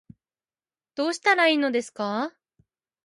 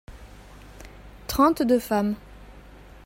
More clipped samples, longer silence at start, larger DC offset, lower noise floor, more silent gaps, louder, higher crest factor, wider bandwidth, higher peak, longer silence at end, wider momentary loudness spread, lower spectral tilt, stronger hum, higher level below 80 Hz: neither; first, 0.95 s vs 0.1 s; neither; first, under -90 dBFS vs -46 dBFS; neither; about the same, -24 LUFS vs -23 LUFS; about the same, 20 dB vs 20 dB; second, 11.5 kHz vs 16.5 kHz; about the same, -6 dBFS vs -6 dBFS; first, 0.75 s vs 0.45 s; second, 12 LU vs 25 LU; second, -3 dB/octave vs -5.5 dB/octave; neither; second, -76 dBFS vs -46 dBFS